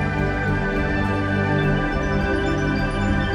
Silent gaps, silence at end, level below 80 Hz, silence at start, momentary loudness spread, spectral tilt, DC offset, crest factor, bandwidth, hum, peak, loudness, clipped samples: none; 0 s; -30 dBFS; 0 s; 2 LU; -7 dB/octave; 0.3%; 12 dB; 10 kHz; 50 Hz at -35 dBFS; -8 dBFS; -22 LUFS; under 0.1%